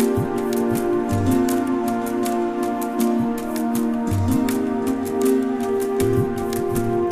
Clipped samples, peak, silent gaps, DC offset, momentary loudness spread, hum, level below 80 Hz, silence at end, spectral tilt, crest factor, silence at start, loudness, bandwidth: under 0.1%; -8 dBFS; none; 0.3%; 4 LU; none; -44 dBFS; 0 s; -6.5 dB/octave; 14 dB; 0 s; -21 LUFS; 15.5 kHz